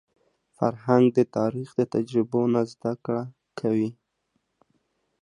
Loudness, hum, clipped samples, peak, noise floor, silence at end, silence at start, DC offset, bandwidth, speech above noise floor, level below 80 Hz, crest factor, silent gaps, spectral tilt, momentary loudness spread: -25 LUFS; none; under 0.1%; -6 dBFS; -75 dBFS; 1.3 s; 0.6 s; under 0.1%; 10.5 kHz; 51 dB; -70 dBFS; 20 dB; none; -8.5 dB/octave; 11 LU